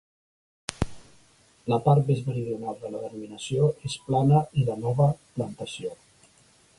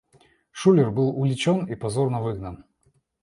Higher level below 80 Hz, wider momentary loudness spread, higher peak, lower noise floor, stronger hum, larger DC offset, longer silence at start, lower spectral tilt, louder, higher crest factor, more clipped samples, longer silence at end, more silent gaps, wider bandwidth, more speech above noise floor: about the same, -50 dBFS vs -54 dBFS; about the same, 15 LU vs 15 LU; about the same, -4 dBFS vs -6 dBFS; second, -59 dBFS vs -66 dBFS; neither; neither; first, 0.7 s vs 0.55 s; about the same, -7 dB/octave vs -7 dB/octave; second, -26 LUFS vs -23 LUFS; first, 24 dB vs 18 dB; neither; first, 0.85 s vs 0.7 s; neither; about the same, 11.5 kHz vs 11.5 kHz; second, 34 dB vs 44 dB